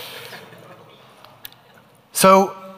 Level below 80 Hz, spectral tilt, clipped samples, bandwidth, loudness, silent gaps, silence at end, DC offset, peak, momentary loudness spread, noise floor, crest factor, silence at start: -62 dBFS; -4 dB/octave; under 0.1%; 16 kHz; -15 LUFS; none; 0.1 s; under 0.1%; 0 dBFS; 27 LU; -51 dBFS; 22 dB; 0 s